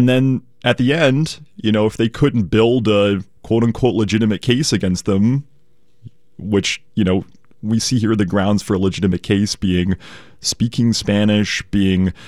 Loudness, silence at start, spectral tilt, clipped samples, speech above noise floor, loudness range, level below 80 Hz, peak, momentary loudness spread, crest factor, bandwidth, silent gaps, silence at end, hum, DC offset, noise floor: -17 LUFS; 0 s; -5.5 dB/octave; under 0.1%; 44 dB; 3 LU; -44 dBFS; -2 dBFS; 7 LU; 16 dB; 14 kHz; none; 0 s; none; 0.6%; -60 dBFS